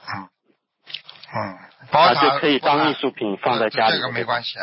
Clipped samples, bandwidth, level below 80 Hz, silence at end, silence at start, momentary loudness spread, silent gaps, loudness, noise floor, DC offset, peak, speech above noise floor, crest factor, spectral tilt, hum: under 0.1%; 5.8 kHz; -64 dBFS; 0 s; 0.05 s; 18 LU; none; -19 LUFS; -67 dBFS; under 0.1%; -4 dBFS; 47 dB; 16 dB; -8.5 dB/octave; none